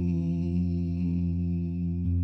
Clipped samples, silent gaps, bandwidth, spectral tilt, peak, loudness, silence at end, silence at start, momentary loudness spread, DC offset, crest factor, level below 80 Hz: under 0.1%; none; 5.6 kHz; -11 dB/octave; -18 dBFS; -29 LUFS; 0 s; 0 s; 2 LU; under 0.1%; 10 dB; -40 dBFS